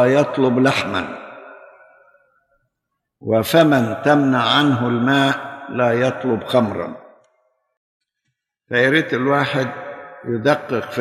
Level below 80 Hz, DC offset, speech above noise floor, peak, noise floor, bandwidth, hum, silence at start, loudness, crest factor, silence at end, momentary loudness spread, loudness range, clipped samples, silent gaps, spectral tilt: -62 dBFS; under 0.1%; 61 dB; -2 dBFS; -78 dBFS; 14.5 kHz; none; 0 s; -17 LUFS; 16 dB; 0 s; 14 LU; 6 LU; under 0.1%; 7.77-8.00 s; -6 dB/octave